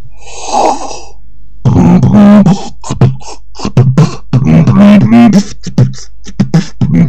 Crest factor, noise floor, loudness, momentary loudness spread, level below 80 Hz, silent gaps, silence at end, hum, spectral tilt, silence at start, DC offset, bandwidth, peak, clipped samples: 8 dB; -35 dBFS; -7 LUFS; 19 LU; -30 dBFS; none; 0 s; none; -7.5 dB/octave; 0 s; 10%; 8.8 kHz; 0 dBFS; 5%